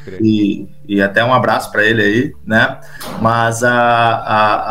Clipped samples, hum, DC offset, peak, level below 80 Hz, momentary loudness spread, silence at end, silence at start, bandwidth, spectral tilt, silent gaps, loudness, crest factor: under 0.1%; none; 2%; 0 dBFS; -44 dBFS; 7 LU; 0 s; 0 s; 16 kHz; -5.5 dB/octave; none; -13 LUFS; 14 dB